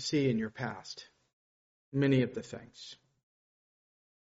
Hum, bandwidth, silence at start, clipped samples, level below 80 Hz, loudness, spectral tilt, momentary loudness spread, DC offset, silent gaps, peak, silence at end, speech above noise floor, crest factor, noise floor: none; 7.6 kHz; 0 s; under 0.1%; -70 dBFS; -32 LUFS; -6 dB/octave; 20 LU; under 0.1%; 1.33-1.92 s; -16 dBFS; 1.3 s; over 57 dB; 18 dB; under -90 dBFS